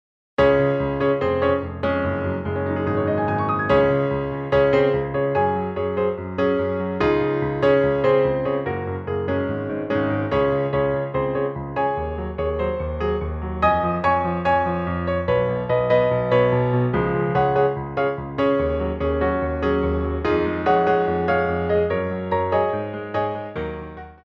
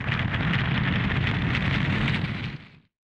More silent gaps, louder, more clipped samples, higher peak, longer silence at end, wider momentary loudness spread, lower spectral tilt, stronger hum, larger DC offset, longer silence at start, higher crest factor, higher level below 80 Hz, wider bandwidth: neither; first, -21 LUFS vs -25 LUFS; neither; first, -4 dBFS vs -10 dBFS; second, 0.1 s vs 0.45 s; about the same, 7 LU vs 8 LU; first, -9 dB/octave vs -7 dB/octave; neither; neither; first, 0.4 s vs 0 s; about the same, 16 dB vs 16 dB; about the same, -38 dBFS vs -38 dBFS; second, 6.2 kHz vs 8 kHz